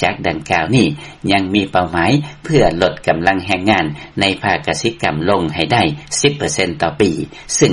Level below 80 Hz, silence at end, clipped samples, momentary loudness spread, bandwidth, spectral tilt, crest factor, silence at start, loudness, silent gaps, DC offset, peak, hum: -40 dBFS; 0 s; under 0.1%; 4 LU; 11.5 kHz; -4.5 dB/octave; 16 dB; 0 s; -16 LUFS; none; under 0.1%; 0 dBFS; none